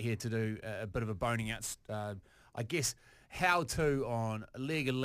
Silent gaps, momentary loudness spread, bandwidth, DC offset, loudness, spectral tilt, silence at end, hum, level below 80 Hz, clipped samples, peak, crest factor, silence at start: none; 13 LU; 15.5 kHz; under 0.1%; -36 LUFS; -4.5 dB/octave; 0 s; none; -56 dBFS; under 0.1%; -14 dBFS; 22 dB; 0 s